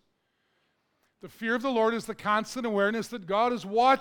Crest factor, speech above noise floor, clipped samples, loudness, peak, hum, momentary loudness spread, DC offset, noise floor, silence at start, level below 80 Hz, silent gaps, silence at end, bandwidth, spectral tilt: 18 dB; 48 dB; under 0.1%; -28 LUFS; -10 dBFS; none; 6 LU; under 0.1%; -75 dBFS; 1.25 s; -68 dBFS; none; 0 s; 19 kHz; -4.5 dB/octave